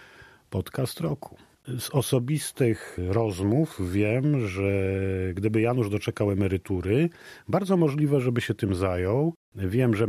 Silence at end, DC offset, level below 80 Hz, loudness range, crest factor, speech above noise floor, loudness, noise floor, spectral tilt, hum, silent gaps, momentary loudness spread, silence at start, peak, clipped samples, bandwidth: 0 s; under 0.1%; -54 dBFS; 2 LU; 16 dB; 27 dB; -26 LUFS; -52 dBFS; -7 dB/octave; none; 9.36-9.52 s; 8 LU; 0 s; -10 dBFS; under 0.1%; 14.5 kHz